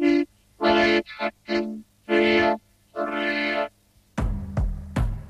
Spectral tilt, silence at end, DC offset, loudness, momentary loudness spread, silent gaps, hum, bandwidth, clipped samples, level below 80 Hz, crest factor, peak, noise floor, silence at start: -6.5 dB/octave; 0 s; under 0.1%; -24 LUFS; 13 LU; none; none; 11.5 kHz; under 0.1%; -36 dBFS; 16 dB; -8 dBFS; -56 dBFS; 0 s